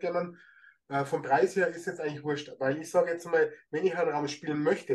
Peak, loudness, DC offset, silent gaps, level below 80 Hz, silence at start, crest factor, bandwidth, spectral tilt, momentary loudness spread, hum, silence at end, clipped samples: -12 dBFS; -30 LUFS; under 0.1%; none; -78 dBFS; 0 s; 16 dB; 12.5 kHz; -5.5 dB/octave; 8 LU; none; 0 s; under 0.1%